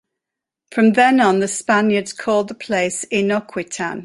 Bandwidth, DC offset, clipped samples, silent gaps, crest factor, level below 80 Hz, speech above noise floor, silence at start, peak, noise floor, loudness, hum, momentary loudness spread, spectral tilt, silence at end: 11.5 kHz; under 0.1%; under 0.1%; none; 16 dB; -62 dBFS; 67 dB; 0.7 s; -2 dBFS; -85 dBFS; -17 LUFS; none; 11 LU; -4.5 dB/octave; 0 s